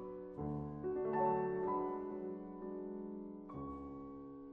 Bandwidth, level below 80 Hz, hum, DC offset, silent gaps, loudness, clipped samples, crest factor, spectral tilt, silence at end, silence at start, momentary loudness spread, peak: 3.5 kHz; -64 dBFS; none; under 0.1%; none; -42 LUFS; under 0.1%; 16 dB; -11 dB/octave; 0 s; 0 s; 13 LU; -24 dBFS